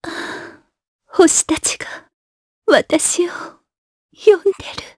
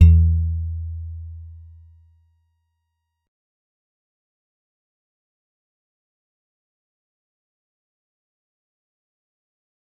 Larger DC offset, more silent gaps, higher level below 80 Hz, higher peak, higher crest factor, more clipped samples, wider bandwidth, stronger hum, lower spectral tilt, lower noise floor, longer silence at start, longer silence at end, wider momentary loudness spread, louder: neither; first, 0.88-0.99 s, 2.13-2.62 s, 3.78-4.09 s vs none; second, -52 dBFS vs -34 dBFS; about the same, 0 dBFS vs -2 dBFS; second, 18 dB vs 24 dB; neither; first, 11 kHz vs 2.9 kHz; neither; second, -2 dB/octave vs -11 dB/octave; second, -39 dBFS vs -77 dBFS; about the same, 0.05 s vs 0 s; second, 0.1 s vs 8.45 s; second, 19 LU vs 24 LU; first, -16 LUFS vs -21 LUFS